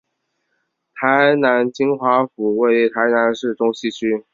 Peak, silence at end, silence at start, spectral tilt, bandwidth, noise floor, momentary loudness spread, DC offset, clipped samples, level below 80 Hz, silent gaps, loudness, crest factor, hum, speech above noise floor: -2 dBFS; 0.15 s; 0.95 s; -5.5 dB/octave; 7.6 kHz; -72 dBFS; 7 LU; under 0.1%; under 0.1%; -66 dBFS; none; -17 LUFS; 16 dB; none; 55 dB